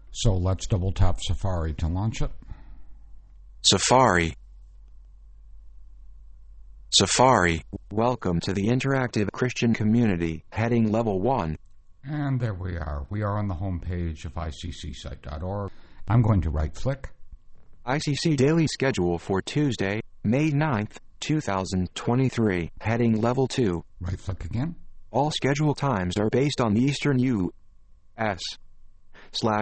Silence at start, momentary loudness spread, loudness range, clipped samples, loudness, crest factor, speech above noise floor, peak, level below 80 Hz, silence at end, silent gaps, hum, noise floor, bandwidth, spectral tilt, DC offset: 0.05 s; 13 LU; 5 LU; under 0.1%; -25 LUFS; 20 dB; 26 dB; -4 dBFS; -38 dBFS; 0 s; none; none; -50 dBFS; 8.8 kHz; -5 dB/octave; under 0.1%